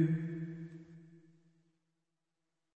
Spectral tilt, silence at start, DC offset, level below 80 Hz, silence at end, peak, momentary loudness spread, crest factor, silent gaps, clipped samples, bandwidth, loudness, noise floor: -10.5 dB/octave; 0 s; under 0.1%; -82 dBFS; 1.6 s; -20 dBFS; 23 LU; 22 dB; none; under 0.1%; 3.6 kHz; -40 LUFS; -88 dBFS